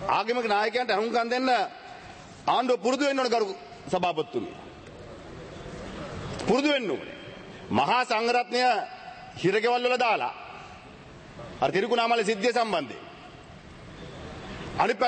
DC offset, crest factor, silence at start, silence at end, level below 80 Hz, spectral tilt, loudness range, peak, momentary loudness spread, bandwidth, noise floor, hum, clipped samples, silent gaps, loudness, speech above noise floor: under 0.1%; 18 dB; 0 s; 0 s; -56 dBFS; -4.5 dB/octave; 5 LU; -10 dBFS; 21 LU; 8.8 kHz; -47 dBFS; none; under 0.1%; none; -26 LUFS; 21 dB